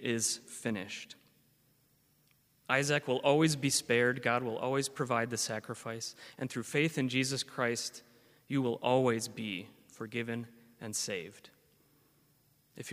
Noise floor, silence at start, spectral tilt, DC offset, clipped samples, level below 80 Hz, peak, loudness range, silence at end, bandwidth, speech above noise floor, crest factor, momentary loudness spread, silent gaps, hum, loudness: -70 dBFS; 0 s; -4 dB/octave; under 0.1%; under 0.1%; -76 dBFS; -12 dBFS; 6 LU; 0 s; 15.5 kHz; 37 dB; 24 dB; 14 LU; none; none; -33 LUFS